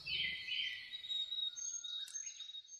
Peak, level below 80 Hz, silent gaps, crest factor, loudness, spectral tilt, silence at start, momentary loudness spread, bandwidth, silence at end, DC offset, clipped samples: -28 dBFS; -76 dBFS; none; 16 dB; -40 LUFS; 2.5 dB/octave; 0 s; 7 LU; 13 kHz; 0 s; under 0.1%; under 0.1%